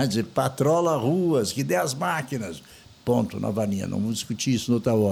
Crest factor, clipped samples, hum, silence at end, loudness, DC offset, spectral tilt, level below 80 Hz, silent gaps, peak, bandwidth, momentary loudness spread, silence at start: 16 dB; under 0.1%; none; 0 s; -25 LUFS; under 0.1%; -5.5 dB/octave; -58 dBFS; none; -8 dBFS; 19 kHz; 8 LU; 0 s